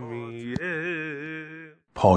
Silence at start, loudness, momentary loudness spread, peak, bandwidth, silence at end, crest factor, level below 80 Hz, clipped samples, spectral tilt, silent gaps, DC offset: 0 s; -30 LUFS; 14 LU; -4 dBFS; 10 kHz; 0 s; 22 dB; -56 dBFS; under 0.1%; -7.5 dB/octave; none; under 0.1%